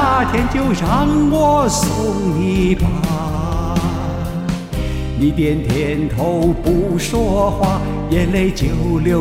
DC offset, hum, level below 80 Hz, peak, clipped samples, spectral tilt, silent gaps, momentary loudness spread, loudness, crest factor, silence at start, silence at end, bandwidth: under 0.1%; none; -26 dBFS; -2 dBFS; under 0.1%; -6 dB/octave; none; 7 LU; -17 LUFS; 14 dB; 0 s; 0 s; 16.5 kHz